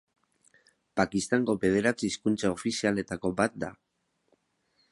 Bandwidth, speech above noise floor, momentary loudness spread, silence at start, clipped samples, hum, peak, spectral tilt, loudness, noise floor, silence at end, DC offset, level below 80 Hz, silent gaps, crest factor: 11.5 kHz; 44 dB; 6 LU; 0.95 s; under 0.1%; none; -8 dBFS; -5 dB/octave; -29 LUFS; -72 dBFS; 1.2 s; under 0.1%; -60 dBFS; none; 22 dB